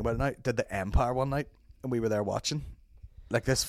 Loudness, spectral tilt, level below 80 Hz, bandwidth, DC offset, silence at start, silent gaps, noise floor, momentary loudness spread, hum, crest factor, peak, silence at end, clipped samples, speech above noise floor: -31 LUFS; -5 dB/octave; -40 dBFS; 16 kHz; under 0.1%; 0 s; none; -51 dBFS; 10 LU; none; 18 dB; -12 dBFS; 0 s; under 0.1%; 21 dB